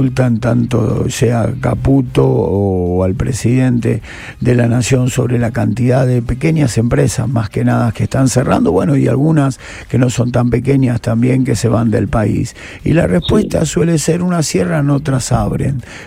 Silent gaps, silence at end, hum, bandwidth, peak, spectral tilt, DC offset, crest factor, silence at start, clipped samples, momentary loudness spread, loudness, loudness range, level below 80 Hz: none; 0 s; none; 15 kHz; 0 dBFS; -6.5 dB/octave; under 0.1%; 12 dB; 0 s; under 0.1%; 4 LU; -14 LUFS; 1 LU; -32 dBFS